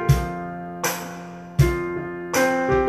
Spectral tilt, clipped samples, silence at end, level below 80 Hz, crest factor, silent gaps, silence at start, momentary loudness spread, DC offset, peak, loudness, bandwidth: -5.5 dB/octave; under 0.1%; 0 s; -34 dBFS; 18 dB; none; 0 s; 12 LU; under 0.1%; -4 dBFS; -24 LUFS; 14 kHz